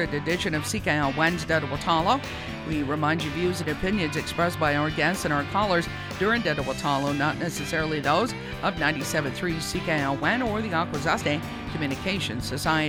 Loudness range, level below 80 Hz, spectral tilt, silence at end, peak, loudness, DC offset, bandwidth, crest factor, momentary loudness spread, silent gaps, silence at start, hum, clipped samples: 1 LU; -44 dBFS; -4.5 dB/octave; 0 s; -8 dBFS; -26 LUFS; under 0.1%; over 20 kHz; 18 dB; 6 LU; none; 0 s; none; under 0.1%